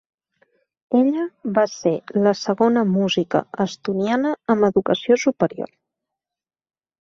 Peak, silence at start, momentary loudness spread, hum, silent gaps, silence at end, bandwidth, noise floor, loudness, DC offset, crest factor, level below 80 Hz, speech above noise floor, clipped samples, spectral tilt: -2 dBFS; 0.9 s; 6 LU; none; none; 1.35 s; 7.4 kHz; under -90 dBFS; -20 LUFS; under 0.1%; 18 dB; -62 dBFS; over 71 dB; under 0.1%; -6 dB/octave